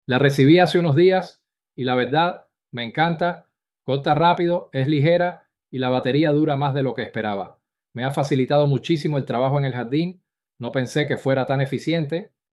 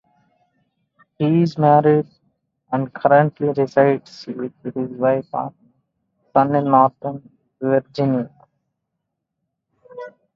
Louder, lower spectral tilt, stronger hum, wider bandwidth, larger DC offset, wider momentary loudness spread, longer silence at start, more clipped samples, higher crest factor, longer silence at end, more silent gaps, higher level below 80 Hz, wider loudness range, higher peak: about the same, -21 LUFS vs -19 LUFS; second, -7 dB/octave vs -9 dB/octave; neither; first, 12 kHz vs 7.2 kHz; neither; second, 13 LU vs 18 LU; second, 0.1 s vs 1.2 s; neither; about the same, 18 dB vs 20 dB; about the same, 0.25 s vs 0.25 s; neither; about the same, -62 dBFS vs -64 dBFS; about the same, 3 LU vs 4 LU; about the same, -2 dBFS vs 0 dBFS